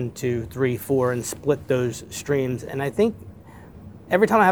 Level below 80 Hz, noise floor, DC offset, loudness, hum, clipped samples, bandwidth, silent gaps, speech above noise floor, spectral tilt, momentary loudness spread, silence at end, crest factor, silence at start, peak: -52 dBFS; -44 dBFS; 0.1%; -23 LUFS; none; under 0.1%; over 20 kHz; none; 21 dB; -6 dB/octave; 20 LU; 0 s; 20 dB; 0 s; -2 dBFS